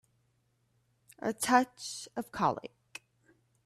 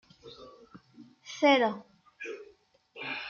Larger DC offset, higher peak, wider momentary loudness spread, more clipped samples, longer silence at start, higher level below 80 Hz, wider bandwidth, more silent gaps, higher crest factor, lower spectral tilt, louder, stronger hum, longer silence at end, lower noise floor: neither; about the same, -12 dBFS vs -12 dBFS; second, 23 LU vs 27 LU; neither; first, 1.2 s vs 0.25 s; first, -72 dBFS vs -78 dBFS; first, 14.5 kHz vs 7.2 kHz; neither; about the same, 24 dB vs 22 dB; about the same, -3.5 dB/octave vs -4 dB/octave; second, -32 LUFS vs -28 LUFS; neither; first, 1 s vs 0 s; first, -74 dBFS vs -61 dBFS